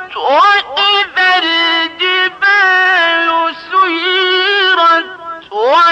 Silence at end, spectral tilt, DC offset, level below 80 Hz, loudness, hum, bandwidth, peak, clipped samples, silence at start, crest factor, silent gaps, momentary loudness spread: 0 s; -1 dB/octave; under 0.1%; -62 dBFS; -10 LUFS; none; 10 kHz; -2 dBFS; under 0.1%; 0 s; 10 dB; none; 6 LU